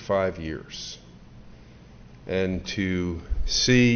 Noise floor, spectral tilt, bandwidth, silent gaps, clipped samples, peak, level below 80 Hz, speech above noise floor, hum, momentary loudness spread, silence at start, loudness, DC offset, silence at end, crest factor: -47 dBFS; -4.5 dB/octave; 6.6 kHz; none; under 0.1%; -8 dBFS; -38 dBFS; 23 dB; none; 16 LU; 0 s; -26 LUFS; under 0.1%; 0 s; 18 dB